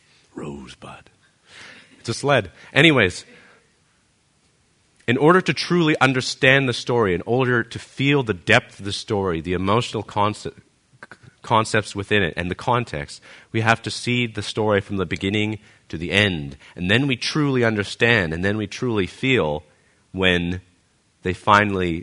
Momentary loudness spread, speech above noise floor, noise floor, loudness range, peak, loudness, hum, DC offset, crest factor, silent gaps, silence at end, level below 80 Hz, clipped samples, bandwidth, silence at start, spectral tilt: 17 LU; 42 dB; -62 dBFS; 5 LU; 0 dBFS; -20 LUFS; none; under 0.1%; 22 dB; none; 0 s; -50 dBFS; under 0.1%; 11 kHz; 0.35 s; -5 dB/octave